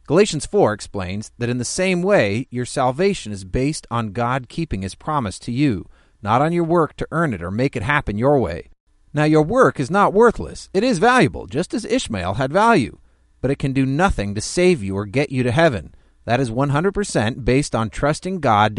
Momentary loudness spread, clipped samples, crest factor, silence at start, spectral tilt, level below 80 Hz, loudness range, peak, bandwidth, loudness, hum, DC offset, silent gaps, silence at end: 10 LU; under 0.1%; 18 dB; 0.1 s; -5.5 dB/octave; -38 dBFS; 4 LU; -2 dBFS; 11.5 kHz; -19 LUFS; none; under 0.1%; 8.80-8.87 s; 0 s